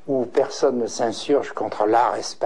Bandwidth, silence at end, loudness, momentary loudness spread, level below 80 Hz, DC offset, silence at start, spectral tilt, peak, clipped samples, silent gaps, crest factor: 10.5 kHz; 0 s; -22 LUFS; 6 LU; -70 dBFS; 1%; 0.05 s; -4 dB/octave; -8 dBFS; under 0.1%; none; 14 dB